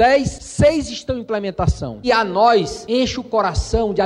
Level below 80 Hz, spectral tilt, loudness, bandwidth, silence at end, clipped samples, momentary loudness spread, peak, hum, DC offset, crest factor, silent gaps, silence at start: -32 dBFS; -5.5 dB/octave; -18 LUFS; 11.5 kHz; 0 s; under 0.1%; 9 LU; -4 dBFS; none; under 0.1%; 14 dB; none; 0 s